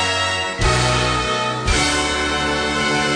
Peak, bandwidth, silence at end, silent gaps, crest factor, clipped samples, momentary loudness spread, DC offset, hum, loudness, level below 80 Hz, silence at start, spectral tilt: -4 dBFS; 10.5 kHz; 0 s; none; 14 dB; under 0.1%; 3 LU; under 0.1%; none; -18 LUFS; -28 dBFS; 0 s; -3 dB/octave